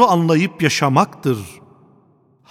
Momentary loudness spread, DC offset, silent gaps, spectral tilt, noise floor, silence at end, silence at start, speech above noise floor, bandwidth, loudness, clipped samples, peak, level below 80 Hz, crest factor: 10 LU; under 0.1%; none; -5.5 dB/octave; -55 dBFS; 1 s; 0 s; 39 dB; 15.5 kHz; -17 LUFS; under 0.1%; 0 dBFS; -60 dBFS; 18 dB